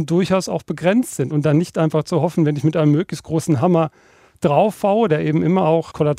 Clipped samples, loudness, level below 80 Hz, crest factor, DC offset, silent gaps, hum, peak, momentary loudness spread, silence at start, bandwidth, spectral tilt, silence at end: under 0.1%; -18 LUFS; -56 dBFS; 16 dB; under 0.1%; none; none; -2 dBFS; 5 LU; 0 s; 14.5 kHz; -7 dB/octave; 0 s